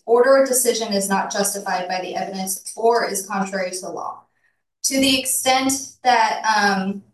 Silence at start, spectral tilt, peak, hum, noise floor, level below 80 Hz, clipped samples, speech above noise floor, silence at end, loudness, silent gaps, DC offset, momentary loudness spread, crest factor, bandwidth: 0.05 s; -2.5 dB/octave; -4 dBFS; none; -68 dBFS; -60 dBFS; under 0.1%; 48 dB; 0.15 s; -19 LUFS; none; under 0.1%; 11 LU; 16 dB; 13 kHz